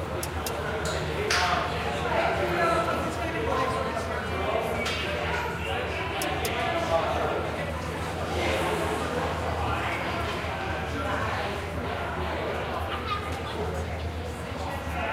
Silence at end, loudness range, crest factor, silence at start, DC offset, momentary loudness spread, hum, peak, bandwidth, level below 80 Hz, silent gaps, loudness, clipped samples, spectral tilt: 0 s; 4 LU; 18 dB; 0 s; under 0.1%; 6 LU; none; -10 dBFS; 16 kHz; -40 dBFS; none; -28 LUFS; under 0.1%; -4.5 dB/octave